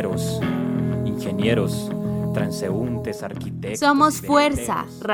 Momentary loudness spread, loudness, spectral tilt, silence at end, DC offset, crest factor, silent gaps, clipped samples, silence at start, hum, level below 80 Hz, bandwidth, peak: 11 LU; -22 LUFS; -5.5 dB/octave; 0 s; under 0.1%; 18 dB; none; under 0.1%; 0 s; none; -46 dBFS; 17 kHz; -4 dBFS